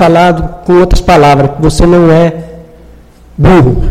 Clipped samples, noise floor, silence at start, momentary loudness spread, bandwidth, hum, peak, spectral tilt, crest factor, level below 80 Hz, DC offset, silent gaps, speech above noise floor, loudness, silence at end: 1%; -35 dBFS; 0 s; 7 LU; 14.5 kHz; none; 0 dBFS; -7 dB/octave; 6 dB; -16 dBFS; under 0.1%; none; 30 dB; -7 LUFS; 0 s